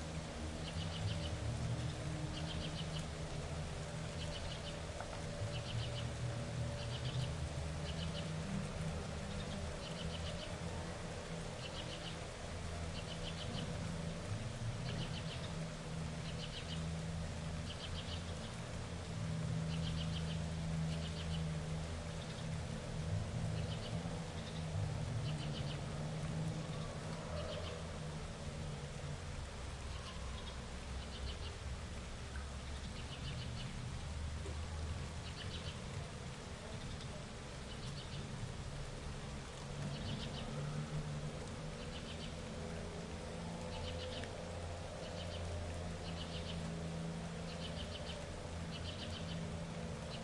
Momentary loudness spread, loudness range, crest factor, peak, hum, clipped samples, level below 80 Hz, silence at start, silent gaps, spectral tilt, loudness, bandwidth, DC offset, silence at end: 5 LU; 4 LU; 14 dB; -28 dBFS; none; under 0.1%; -52 dBFS; 0 s; none; -5 dB/octave; -44 LUFS; 11.5 kHz; under 0.1%; 0 s